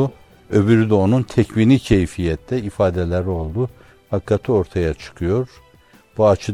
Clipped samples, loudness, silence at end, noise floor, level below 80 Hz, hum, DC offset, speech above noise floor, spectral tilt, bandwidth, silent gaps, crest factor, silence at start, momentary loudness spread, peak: under 0.1%; -19 LUFS; 0 s; -51 dBFS; -40 dBFS; none; 0.2%; 33 dB; -8 dB/octave; 12 kHz; none; 18 dB; 0 s; 10 LU; 0 dBFS